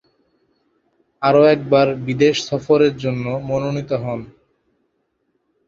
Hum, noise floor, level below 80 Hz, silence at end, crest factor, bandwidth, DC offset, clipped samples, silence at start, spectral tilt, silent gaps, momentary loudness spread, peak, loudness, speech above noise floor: none; -69 dBFS; -54 dBFS; 1.4 s; 18 dB; 7.6 kHz; under 0.1%; under 0.1%; 1.2 s; -6 dB/octave; none; 10 LU; -2 dBFS; -17 LUFS; 52 dB